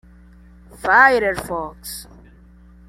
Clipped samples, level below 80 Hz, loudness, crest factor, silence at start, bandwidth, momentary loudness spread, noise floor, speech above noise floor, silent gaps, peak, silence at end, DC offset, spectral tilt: under 0.1%; -46 dBFS; -16 LUFS; 20 dB; 0.8 s; 16.5 kHz; 20 LU; -46 dBFS; 29 dB; none; -2 dBFS; 0.85 s; under 0.1%; -3.5 dB/octave